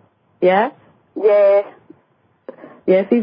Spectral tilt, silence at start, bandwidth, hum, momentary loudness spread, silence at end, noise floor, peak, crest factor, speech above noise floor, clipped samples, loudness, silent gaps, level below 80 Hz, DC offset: -11.5 dB/octave; 0.4 s; 5.2 kHz; none; 15 LU; 0 s; -59 dBFS; -2 dBFS; 16 dB; 46 dB; under 0.1%; -16 LUFS; none; -72 dBFS; under 0.1%